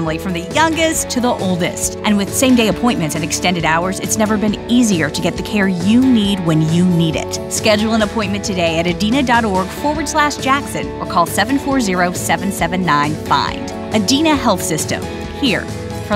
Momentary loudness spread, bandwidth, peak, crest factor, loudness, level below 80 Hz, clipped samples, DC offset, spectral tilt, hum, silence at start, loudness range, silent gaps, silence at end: 6 LU; 16 kHz; 0 dBFS; 14 dB; -16 LUFS; -36 dBFS; under 0.1%; under 0.1%; -4.5 dB/octave; none; 0 s; 2 LU; none; 0 s